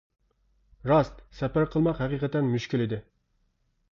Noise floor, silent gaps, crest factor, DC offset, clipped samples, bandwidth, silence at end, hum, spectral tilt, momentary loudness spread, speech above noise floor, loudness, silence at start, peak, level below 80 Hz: -71 dBFS; none; 18 dB; under 0.1%; under 0.1%; 7.2 kHz; 0.9 s; none; -8 dB/octave; 10 LU; 45 dB; -27 LUFS; 0.85 s; -10 dBFS; -50 dBFS